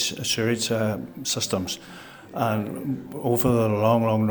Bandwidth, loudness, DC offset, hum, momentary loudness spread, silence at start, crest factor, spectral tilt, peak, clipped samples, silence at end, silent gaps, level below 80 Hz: over 20 kHz; -24 LUFS; under 0.1%; none; 11 LU; 0 s; 18 dB; -4.5 dB/octave; -8 dBFS; under 0.1%; 0 s; none; -54 dBFS